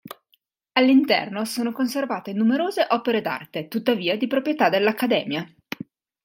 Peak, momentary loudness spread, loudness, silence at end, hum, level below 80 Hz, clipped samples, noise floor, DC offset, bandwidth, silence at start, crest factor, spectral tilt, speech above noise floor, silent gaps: -4 dBFS; 15 LU; -22 LUFS; 0.8 s; none; -74 dBFS; under 0.1%; -67 dBFS; under 0.1%; 17 kHz; 0.05 s; 18 dB; -5 dB/octave; 45 dB; none